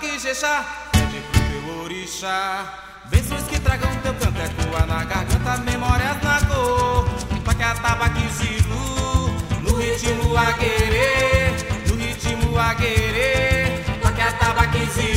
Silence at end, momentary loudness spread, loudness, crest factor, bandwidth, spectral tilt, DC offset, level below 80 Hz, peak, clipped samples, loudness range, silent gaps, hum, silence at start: 0 s; 6 LU; -20 LUFS; 18 dB; 16 kHz; -4.5 dB/octave; under 0.1%; -26 dBFS; -2 dBFS; under 0.1%; 4 LU; none; none; 0 s